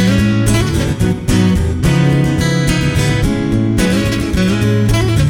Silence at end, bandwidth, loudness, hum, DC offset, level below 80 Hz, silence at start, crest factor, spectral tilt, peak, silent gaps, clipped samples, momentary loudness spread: 0 s; 17 kHz; -14 LUFS; none; under 0.1%; -24 dBFS; 0 s; 12 dB; -6 dB/octave; -2 dBFS; none; under 0.1%; 3 LU